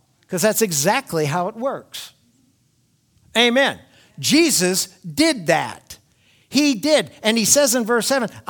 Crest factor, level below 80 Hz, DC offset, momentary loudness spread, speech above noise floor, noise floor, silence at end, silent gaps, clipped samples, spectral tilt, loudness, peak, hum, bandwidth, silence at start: 20 dB; -62 dBFS; under 0.1%; 15 LU; 44 dB; -62 dBFS; 0.1 s; none; under 0.1%; -3 dB/octave; -18 LUFS; 0 dBFS; none; 19.5 kHz; 0.3 s